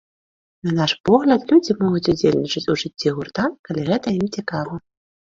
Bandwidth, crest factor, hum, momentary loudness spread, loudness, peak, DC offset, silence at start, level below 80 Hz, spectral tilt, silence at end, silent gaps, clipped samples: 7.6 kHz; 18 dB; none; 10 LU; -20 LUFS; -2 dBFS; under 0.1%; 0.65 s; -52 dBFS; -6 dB/octave; 0.4 s; 1.00-1.04 s, 3.59-3.64 s; under 0.1%